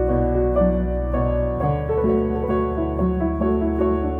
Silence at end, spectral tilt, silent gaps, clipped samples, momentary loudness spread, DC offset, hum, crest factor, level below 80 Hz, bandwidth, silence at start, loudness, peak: 0 s; -11.5 dB/octave; none; under 0.1%; 3 LU; 0.1%; none; 12 dB; -28 dBFS; 3.6 kHz; 0 s; -21 LUFS; -8 dBFS